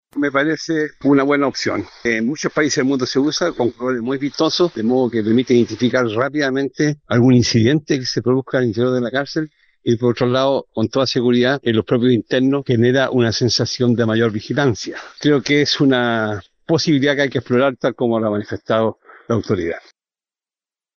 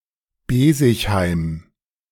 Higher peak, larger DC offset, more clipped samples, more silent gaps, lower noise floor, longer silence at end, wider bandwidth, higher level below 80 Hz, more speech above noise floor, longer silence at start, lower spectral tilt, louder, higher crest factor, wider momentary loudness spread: about the same, -2 dBFS vs -2 dBFS; neither; neither; neither; first, under -90 dBFS vs -39 dBFS; first, 1.2 s vs 0.5 s; second, 7.4 kHz vs 18 kHz; second, -54 dBFS vs -38 dBFS; first, over 73 dB vs 22 dB; second, 0.15 s vs 0.5 s; about the same, -5.5 dB/octave vs -6 dB/octave; about the same, -17 LUFS vs -18 LUFS; about the same, 14 dB vs 16 dB; second, 7 LU vs 12 LU